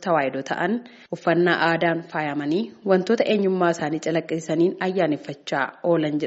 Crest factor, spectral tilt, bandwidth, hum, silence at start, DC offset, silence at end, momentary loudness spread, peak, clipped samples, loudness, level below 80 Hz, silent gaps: 18 dB; -4.5 dB/octave; 8 kHz; none; 0 s; under 0.1%; 0 s; 6 LU; -4 dBFS; under 0.1%; -23 LUFS; -68 dBFS; none